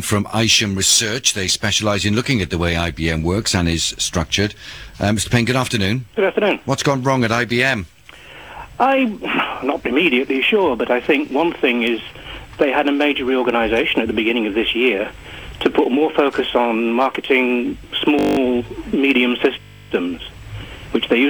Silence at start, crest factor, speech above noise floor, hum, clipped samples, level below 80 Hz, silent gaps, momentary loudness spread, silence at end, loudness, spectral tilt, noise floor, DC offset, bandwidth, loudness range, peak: 0 s; 16 dB; 23 dB; none; under 0.1%; -40 dBFS; none; 10 LU; 0 s; -17 LUFS; -4 dB/octave; -40 dBFS; 0.2%; over 20 kHz; 2 LU; -2 dBFS